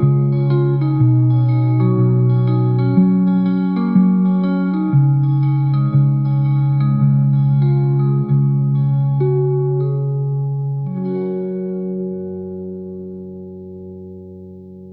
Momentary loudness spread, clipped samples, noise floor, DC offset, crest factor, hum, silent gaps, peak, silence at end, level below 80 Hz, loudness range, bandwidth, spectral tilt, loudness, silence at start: 17 LU; under 0.1%; -35 dBFS; 0.2%; 12 dB; none; none; -2 dBFS; 0 s; -50 dBFS; 10 LU; 4.2 kHz; -14 dB/octave; -16 LUFS; 0 s